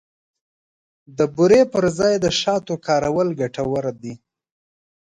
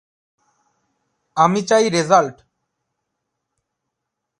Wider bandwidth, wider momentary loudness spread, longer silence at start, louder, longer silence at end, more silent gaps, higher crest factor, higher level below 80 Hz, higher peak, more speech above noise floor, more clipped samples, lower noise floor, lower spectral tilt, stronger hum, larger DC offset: about the same, 11 kHz vs 11.5 kHz; about the same, 13 LU vs 11 LU; second, 1.1 s vs 1.35 s; about the same, -19 LUFS vs -17 LUFS; second, 0.9 s vs 2.05 s; neither; about the same, 18 dB vs 22 dB; first, -52 dBFS vs -68 dBFS; second, -4 dBFS vs 0 dBFS; first, over 71 dB vs 64 dB; neither; first, under -90 dBFS vs -80 dBFS; about the same, -5 dB/octave vs -4.5 dB/octave; neither; neither